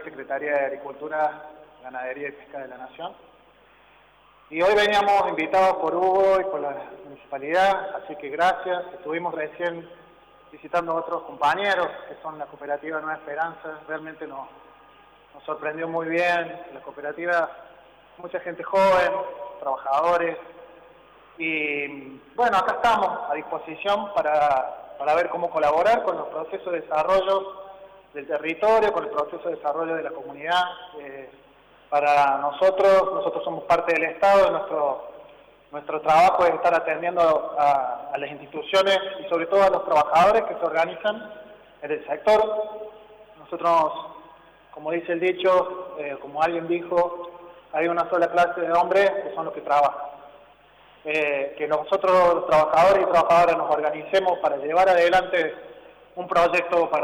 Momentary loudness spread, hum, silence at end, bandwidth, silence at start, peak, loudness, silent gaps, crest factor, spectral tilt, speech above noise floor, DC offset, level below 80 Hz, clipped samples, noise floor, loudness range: 18 LU; 50 Hz at -70 dBFS; 0 s; 13.5 kHz; 0 s; -12 dBFS; -22 LUFS; none; 12 dB; -4.5 dB/octave; 32 dB; under 0.1%; -58 dBFS; under 0.1%; -55 dBFS; 7 LU